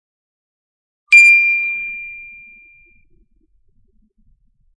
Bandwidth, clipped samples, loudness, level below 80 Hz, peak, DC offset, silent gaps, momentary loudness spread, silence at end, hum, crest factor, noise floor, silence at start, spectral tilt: 10 kHz; under 0.1%; -9 LUFS; -58 dBFS; 0 dBFS; under 0.1%; none; 24 LU; 2.5 s; none; 18 dB; -57 dBFS; 1.1 s; 3 dB/octave